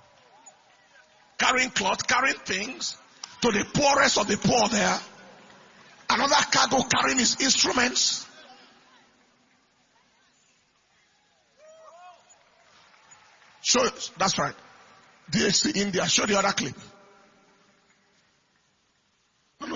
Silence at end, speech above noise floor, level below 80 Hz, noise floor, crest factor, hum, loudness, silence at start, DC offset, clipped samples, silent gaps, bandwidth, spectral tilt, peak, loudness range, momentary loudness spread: 0 s; 45 dB; -60 dBFS; -69 dBFS; 24 dB; none; -23 LUFS; 1.4 s; under 0.1%; under 0.1%; none; 7.6 kHz; -2 dB/octave; -4 dBFS; 8 LU; 12 LU